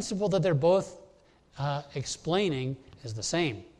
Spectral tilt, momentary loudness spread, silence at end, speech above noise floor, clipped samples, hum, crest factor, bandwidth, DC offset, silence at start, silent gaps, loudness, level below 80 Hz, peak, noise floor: -5 dB/octave; 12 LU; 0.1 s; 31 dB; under 0.1%; none; 16 dB; 11.5 kHz; under 0.1%; 0 s; none; -29 LUFS; -58 dBFS; -14 dBFS; -60 dBFS